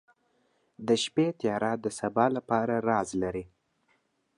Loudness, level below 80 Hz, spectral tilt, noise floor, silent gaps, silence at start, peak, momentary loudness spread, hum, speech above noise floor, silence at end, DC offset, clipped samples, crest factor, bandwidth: -29 LUFS; -62 dBFS; -5 dB/octave; -72 dBFS; none; 0.8 s; -10 dBFS; 6 LU; none; 44 dB; 0.9 s; under 0.1%; under 0.1%; 20 dB; 11.5 kHz